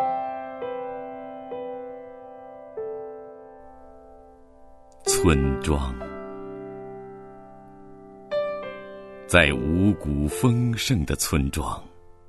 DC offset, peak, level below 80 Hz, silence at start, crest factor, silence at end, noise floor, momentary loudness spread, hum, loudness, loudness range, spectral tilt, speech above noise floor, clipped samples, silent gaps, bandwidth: under 0.1%; 0 dBFS; -38 dBFS; 0 s; 26 dB; 0 s; -49 dBFS; 23 LU; none; -25 LUFS; 15 LU; -5 dB/octave; 27 dB; under 0.1%; none; 12.5 kHz